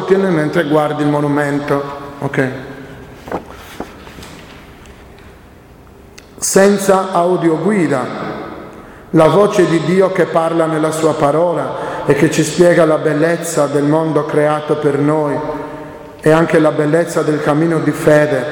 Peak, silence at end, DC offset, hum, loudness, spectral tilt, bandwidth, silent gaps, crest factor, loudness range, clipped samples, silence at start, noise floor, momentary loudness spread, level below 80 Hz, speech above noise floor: 0 dBFS; 0 s; under 0.1%; none; -14 LUFS; -6 dB/octave; 17.5 kHz; none; 14 dB; 12 LU; under 0.1%; 0 s; -40 dBFS; 19 LU; -46 dBFS; 27 dB